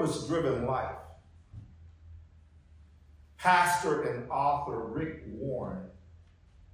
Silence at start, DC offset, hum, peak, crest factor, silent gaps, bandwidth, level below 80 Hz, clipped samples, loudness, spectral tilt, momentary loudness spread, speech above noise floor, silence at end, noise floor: 0 s; under 0.1%; none; -10 dBFS; 22 dB; none; 16 kHz; -54 dBFS; under 0.1%; -30 LUFS; -5 dB/octave; 25 LU; 27 dB; 0.5 s; -58 dBFS